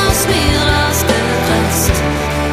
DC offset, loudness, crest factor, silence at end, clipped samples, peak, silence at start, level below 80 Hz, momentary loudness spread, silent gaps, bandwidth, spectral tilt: under 0.1%; -13 LUFS; 12 dB; 0 s; under 0.1%; 0 dBFS; 0 s; -22 dBFS; 3 LU; none; 15.5 kHz; -4 dB/octave